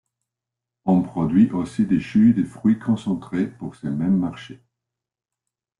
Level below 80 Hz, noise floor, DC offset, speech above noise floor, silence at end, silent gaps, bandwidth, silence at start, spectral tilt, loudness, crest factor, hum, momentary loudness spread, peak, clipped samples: -56 dBFS; -87 dBFS; under 0.1%; 67 dB; 1.25 s; none; 10.5 kHz; 0.85 s; -8.5 dB/octave; -21 LUFS; 16 dB; none; 11 LU; -6 dBFS; under 0.1%